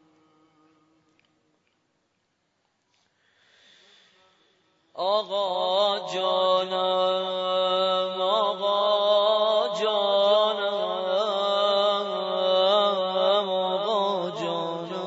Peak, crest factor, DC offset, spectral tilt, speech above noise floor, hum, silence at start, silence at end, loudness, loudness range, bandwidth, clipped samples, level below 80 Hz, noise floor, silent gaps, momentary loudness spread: -10 dBFS; 16 dB; under 0.1%; -4 dB/octave; 49 dB; none; 4.95 s; 0 s; -24 LUFS; 6 LU; 7.8 kHz; under 0.1%; -88 dBFS; -73 dBFS; none; 6 LU